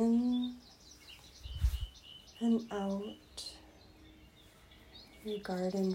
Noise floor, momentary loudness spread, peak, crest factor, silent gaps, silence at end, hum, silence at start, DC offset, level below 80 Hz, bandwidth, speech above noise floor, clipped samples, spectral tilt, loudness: -60 dBFS; 25 LU; -20 dBFS; 16 dB; none; 0 s; none; 0 s; under 0.1%; -46 dBFS; 16 kHz; 23 dB; under 0.1%; -6.5 dB/octave; -37 LUFS